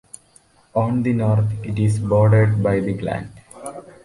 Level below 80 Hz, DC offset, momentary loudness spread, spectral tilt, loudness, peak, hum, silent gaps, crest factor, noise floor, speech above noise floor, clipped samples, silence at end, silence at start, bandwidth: -44 dBFS; under 0.1%; 20 LU; -8.5 dB/octave; -19 LUFS; -4 dBFS; none; none; 14 dB; -54 dBFS; 36 dB; under 0.1%; 0.25 s; 0.75 s; 11.5 kHz